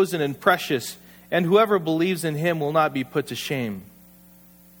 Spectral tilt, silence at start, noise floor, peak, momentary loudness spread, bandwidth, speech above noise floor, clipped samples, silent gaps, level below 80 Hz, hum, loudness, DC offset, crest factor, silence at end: -5.5 dB/octave; 0 s; -51 dBFS; -4 dBFS; 11 LU; over 20 kHz; 29 dB; under 0.1%; none; -64 dBFS; none; -23 LUFS; under 0.1%; 20 dB; 0.95 s